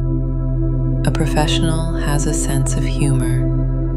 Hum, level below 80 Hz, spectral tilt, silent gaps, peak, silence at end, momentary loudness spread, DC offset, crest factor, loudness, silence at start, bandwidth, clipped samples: none; -20 dBFS; -5.5 dB/octave; none; -4 dBFS; 0 s; 4 LU; under 0.1%; 12 dB; -18 LUFS; 0 s; 12.5 kHz; under 0.1%